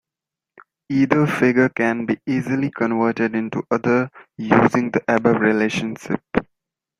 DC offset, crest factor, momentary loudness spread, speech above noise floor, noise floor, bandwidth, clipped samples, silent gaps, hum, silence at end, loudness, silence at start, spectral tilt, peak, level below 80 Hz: under 0.1%; 20 dB; 9 LU; 68 dB; -87 dBFS; 11.5 kHz; under 0.1%; none; none; 0.55 s; -19 LUFS; 0.9 s; -7 dB/octave; 0 dBFS; -56 dBFS